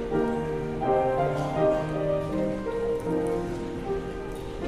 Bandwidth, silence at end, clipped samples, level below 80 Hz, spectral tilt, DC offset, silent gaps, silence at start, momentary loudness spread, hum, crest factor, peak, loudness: 13.5 kHz; 0 s; under 0.1%; -42 dBFS; -7.5 dB/octave; under 0.1%; none; 0 s; 8 LU; none; 14 dB; -12 dBFS; -28 LUFS